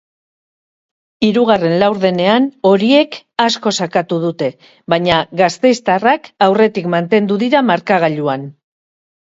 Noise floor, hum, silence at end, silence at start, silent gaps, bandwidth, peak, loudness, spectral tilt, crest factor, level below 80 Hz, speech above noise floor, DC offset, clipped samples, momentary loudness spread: under -90 dBFS; none; 0.75 s; 1.2 s; none; 8 kHz; 0 dBFS; -14 LUFS; -5.5 dB/octave; 14 dB; -54 dBFS; over 77 dB; under 0.1%; under 0.1%; 7 LU